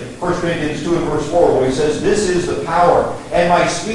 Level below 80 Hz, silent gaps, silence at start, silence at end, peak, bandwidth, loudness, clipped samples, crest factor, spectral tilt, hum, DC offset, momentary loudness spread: -36 dBFS; none; 0 s; 0 s; 0 dBFS; 11.5 kHz; -16 LUFS; under 0.1%; 16 dB; -5 dB/octave; none; under 0.1%; 6 LU